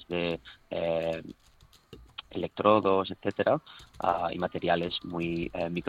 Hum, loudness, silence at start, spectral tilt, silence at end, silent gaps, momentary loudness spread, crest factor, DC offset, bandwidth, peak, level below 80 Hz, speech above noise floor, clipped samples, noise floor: none; -30 LUFS; 0 s; -7 dB/octave; 0 s; none; 15 LU; 22 dB; under 0.1%; 10.5 kHz; -8 dBFS; -58 dBFS; 26 dB; under 0.1%; -55 dBFS